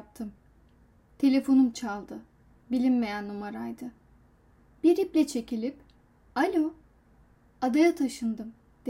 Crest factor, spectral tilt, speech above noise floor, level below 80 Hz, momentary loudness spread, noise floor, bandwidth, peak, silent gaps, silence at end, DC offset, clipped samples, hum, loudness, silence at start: 18 dB; -5 dB/octave; 34 dB; -62 dBFS; 18 LU; -60 dBFS; 15.5 kHz; -12 dBFS; none; 0 s; under 0.1%; under 0.1%; none; -28 LUFS; 0.2 s